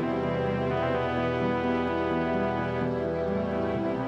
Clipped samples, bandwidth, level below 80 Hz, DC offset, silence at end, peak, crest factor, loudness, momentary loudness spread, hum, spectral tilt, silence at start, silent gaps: under 0.1%; 8 kHz; -52 dBFS; under 0.1%; 0 s; -14 dBFS; 12 dB; -28 LUFS; 2 LU; none; -8 dB/octave; 0 s; none